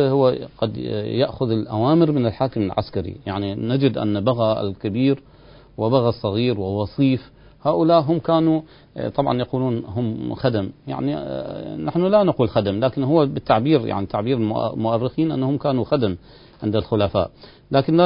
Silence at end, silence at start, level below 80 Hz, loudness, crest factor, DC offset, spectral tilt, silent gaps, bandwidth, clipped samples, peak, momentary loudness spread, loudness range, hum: 0 s; 0 s; -46 dBFS; -21 LUFS; 20 dB; under 0.1%; -12.5 dB/octave; none; 5.4 kHz; under 0.1%; -2 dBFS; 9 LU; 3 LU; none